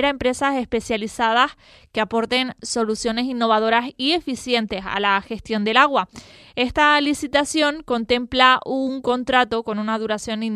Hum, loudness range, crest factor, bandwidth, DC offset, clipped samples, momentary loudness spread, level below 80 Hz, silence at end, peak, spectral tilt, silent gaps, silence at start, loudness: none; 3 LU; 20 dB; 13.5 kHz; under 0.1%; under 0.1%; 9 LU; -48 dBFS; 0 s; 0 dBFS; -3 dB/octave; none; 0 s; -20 LUFS